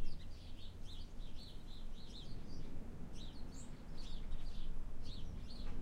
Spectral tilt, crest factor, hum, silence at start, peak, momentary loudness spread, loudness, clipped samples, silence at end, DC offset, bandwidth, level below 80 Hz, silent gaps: -5.5 dB/octave; 14 dB; none; 0 s; -26 dBFS; 4 LU; -53 LUFS; under 0.1%; 0 s; under 0.1%; 8.6 kHz; -46 dBFS; none